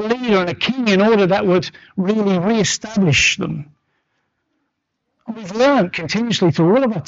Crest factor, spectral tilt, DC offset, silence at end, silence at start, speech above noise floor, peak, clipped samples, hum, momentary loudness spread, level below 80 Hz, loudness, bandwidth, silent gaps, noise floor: 12 dB; -5 dB/octave; under 0.1%; 0.05 s; 0 s; 57 dB; -6 dBFS; under 0.1%; none; 12 LU; -48 dBFS; -16 LUFS; 8 kHz; none; -73 dBFS